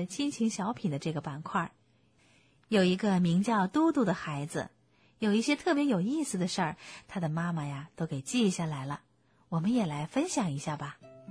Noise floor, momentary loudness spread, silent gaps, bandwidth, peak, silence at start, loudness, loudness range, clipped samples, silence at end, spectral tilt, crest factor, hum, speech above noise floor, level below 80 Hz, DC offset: -66 dBFS; 12 LU; none; 11 kHz; -14 dBFS; 0 s; -31 LUFS; 4 LU; under 0.1%; 0 s; -5.5 dB/octave; 16 dB; none; 36 dB; -68 dBFS; under 0.1%